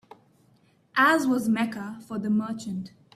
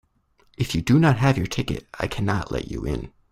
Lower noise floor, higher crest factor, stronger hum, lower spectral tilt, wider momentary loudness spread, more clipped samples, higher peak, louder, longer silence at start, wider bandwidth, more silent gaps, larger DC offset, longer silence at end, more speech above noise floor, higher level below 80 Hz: about the same, -62 dBFS vs -62 dBFS; about the same, 18 dB vs 20 dB; neither; second, -5 dB/octave vs -6.5 dB/octave; first, 15 LU vs 12 LU; neither; second, -10 dBFS vs -4 dBFS; about the same, -25 LUFS vs -23 LUFS; first, 0.95 s vs 0.6 s; about the same, 14.5 kHz vs 15 kHz; neither; neither; about the same, 0.25 s vs 0.25 s; about the same, 37 dB vs 40 dB; second, -70 dBFS vs -40 dBFS